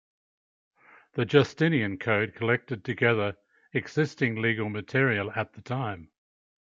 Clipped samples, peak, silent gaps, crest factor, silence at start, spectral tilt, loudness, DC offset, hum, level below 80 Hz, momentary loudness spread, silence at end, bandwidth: under 0.1%; -6 dBFS; none; 22 dB; 1.15 s; -7 dB/octave; -27 LUFS; under 0.1%; none; -68 dBFS; 10 LU; 0.7 s; 7.6 kHz